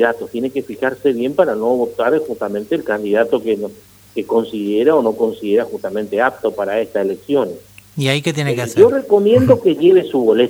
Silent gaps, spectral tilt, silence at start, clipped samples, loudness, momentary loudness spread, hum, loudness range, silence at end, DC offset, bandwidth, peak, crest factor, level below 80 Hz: none; -6 dB/octave; 0 s; under 0.1%; -16 LUFS; 11 LU; none; 4 LU; 0 s; under 0.1%; over 20 kHz; 0 dBFS; 16 dB; -54 dBFS